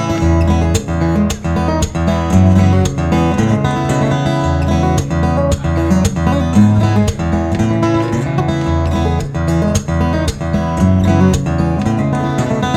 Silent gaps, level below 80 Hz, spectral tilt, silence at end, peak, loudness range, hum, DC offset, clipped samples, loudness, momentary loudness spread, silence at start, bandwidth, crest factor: none; -28 dBFS; -7 dB/octave; 0 s; 0 dBFS; 2 LU; none; under 0.1%; under 0.1%; -14 LUFS; 5 LU; 0 s; 13.5 kHz; 12 dB